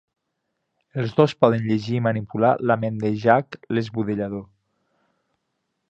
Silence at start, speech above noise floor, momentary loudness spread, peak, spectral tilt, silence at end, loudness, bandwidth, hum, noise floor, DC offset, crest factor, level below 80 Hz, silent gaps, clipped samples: 0.95 s; 56 dB; 9 LU; -2 dBFS; -8 dB/octave; 1.45 s; -22 LUFS; 8 kHz; none; -77 dBFS; under 0.1%; 22 dB; -60 dBFS; none; under 0.1%